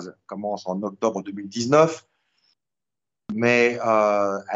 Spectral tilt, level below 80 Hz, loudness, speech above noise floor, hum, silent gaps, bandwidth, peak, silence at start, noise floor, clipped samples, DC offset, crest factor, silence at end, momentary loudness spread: -5 dB/octave; -70 dBFS; -22 LUFS; over 68 dB; none; none; 8 kHz; -4 dBFS; 0 s; under -90 dBFS; under 0.1%; under 0.1%; 20 dB; 0 s; 14 LU